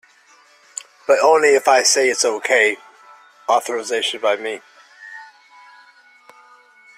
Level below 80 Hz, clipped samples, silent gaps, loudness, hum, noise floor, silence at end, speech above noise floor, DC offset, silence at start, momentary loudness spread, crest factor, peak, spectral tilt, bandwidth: -70 dBFS; under 0.1%; none; -16 LUFS; none; -52 dBFS; 1.75 s; 36 dB; under 0.1%; 1.1 s; 21 LU; 18 dB; -2 dBFS; 0 dB/octave; 15 kHz